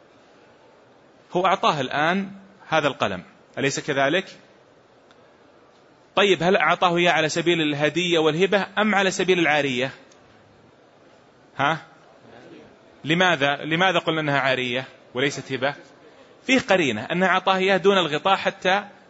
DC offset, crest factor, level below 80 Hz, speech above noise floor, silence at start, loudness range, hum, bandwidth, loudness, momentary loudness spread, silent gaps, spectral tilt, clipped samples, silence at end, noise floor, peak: under 0.1%; 20 dB; -66 dBFS; 33 dB; 1.3 s; 6 LU; none; 8 kHz; -21 LUFS; 9 LU; none; -4.5 dB/octave; under 0.1%; 0.2 s; -54 dBFS; -4 dBFS